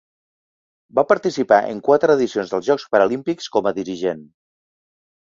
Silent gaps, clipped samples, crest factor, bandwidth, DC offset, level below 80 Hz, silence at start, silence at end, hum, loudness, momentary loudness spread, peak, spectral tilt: none; under 0.1%; 18 dB; 7.6 kHz; under 0.1%; -62 dBFS; 0.95 s; 1.1 s; none; -19 LUFS; 8 LU; -2 dBFS; -5.5 dB/octave